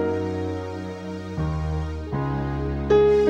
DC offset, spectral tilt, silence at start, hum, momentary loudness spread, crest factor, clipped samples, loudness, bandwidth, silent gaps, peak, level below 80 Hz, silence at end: under 0.1%; -8 dB/octave; 0 s; none; 13 LU; 16 dB; under 0.1%; -26 LUFS; 8.4 kHz; none; -8 dBFS; -34 dBFS; 0 s